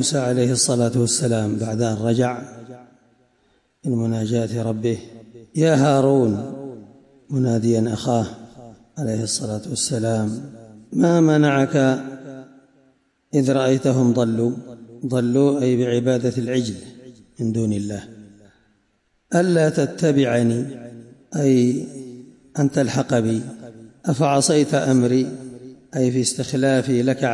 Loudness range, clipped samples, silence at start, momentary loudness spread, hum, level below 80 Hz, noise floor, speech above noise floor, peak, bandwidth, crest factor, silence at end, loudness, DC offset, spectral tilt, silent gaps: 5 LU; under 0.1%; 0 s; 17 LU; none; -60 dBFS; -66 dBFS; 47 dB; -6 dBFS; 11.5 kHz; 14 dB; 0 s; -20 LUFS; under 0.1%; -5.5 dB/octave; none